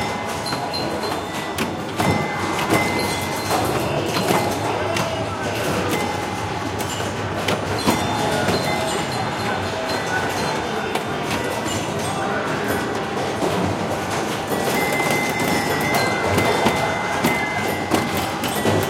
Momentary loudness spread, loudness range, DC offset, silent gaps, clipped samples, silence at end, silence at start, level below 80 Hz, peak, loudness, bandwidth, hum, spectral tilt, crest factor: 5 LU; 3 LU; under 0.1%; none; under 0.1%; 0 s; 0 s; -46 dBFS; -2 dBFS; -21 LUFS; 17 kHz; none; -4 dB/octave; 20 dB